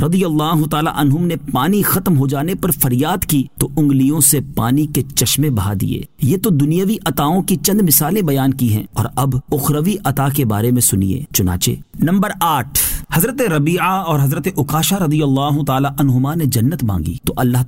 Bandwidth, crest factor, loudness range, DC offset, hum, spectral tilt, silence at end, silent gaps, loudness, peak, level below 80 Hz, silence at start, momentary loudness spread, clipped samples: 16.5 kHz; 14 dB; 1 LU; 0.9%; none; -5 dB/octave; 0 s; none; -15 LUFS; 0 dBFS; -36 dBFS; 0 s; 5 LU; under 0.1%